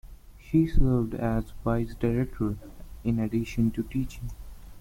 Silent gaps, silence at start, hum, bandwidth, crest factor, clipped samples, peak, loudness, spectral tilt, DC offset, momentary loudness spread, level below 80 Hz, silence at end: none; 0.05 s; none; 16.5 kHz; 18 dB; under 0.1%; -8 dBFS; -28 LUFS; -8.5 dB/octave; under 0.1%; 15 LU; -34 dBFS; 0 s